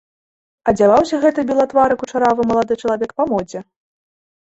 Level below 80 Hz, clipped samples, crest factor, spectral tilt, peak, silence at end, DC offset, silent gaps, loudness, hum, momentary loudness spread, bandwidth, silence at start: -50 dBFS; under 0.1%; 16 dB; -6 dB/octave; -2 dBFS; 0.85 s; under 0.1%; none; -16 LUFS; none; 9 LU; 8.2 kHz; 0.65 s